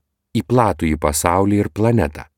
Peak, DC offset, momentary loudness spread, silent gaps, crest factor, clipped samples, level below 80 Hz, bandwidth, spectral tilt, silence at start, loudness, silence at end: 0 dBFS; under 0.1%; 4 LU; none; 18 dB; under 0.1%; -34 dBFS; 17.5 kHz; -6 dB/octave; 0.35 s; -18 LUFS; 0.15 s